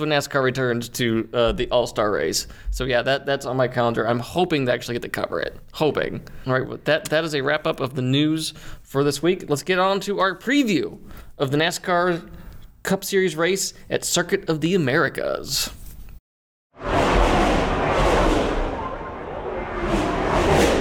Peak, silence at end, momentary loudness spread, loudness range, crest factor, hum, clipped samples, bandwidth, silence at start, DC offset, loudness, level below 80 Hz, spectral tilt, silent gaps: -4 dBFS; 0 s; 10 LU; 2 LU; 18 dB; none; under 0.1%; 18 kHz; 0 s; under 0.1%; -22 LUFS; -34 dBFS; -4.5 dB/octave; 16.20-16.70 s